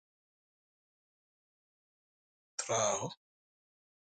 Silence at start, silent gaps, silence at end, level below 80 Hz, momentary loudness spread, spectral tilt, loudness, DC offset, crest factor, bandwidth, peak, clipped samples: 2.6 s; none; 1 s; -82 dBFS; 14 LU; -2 dB/octave; -35 LUFS; under 0.1%; 26 dB; 9.6 kHz; -18 dBFS; under 0.1%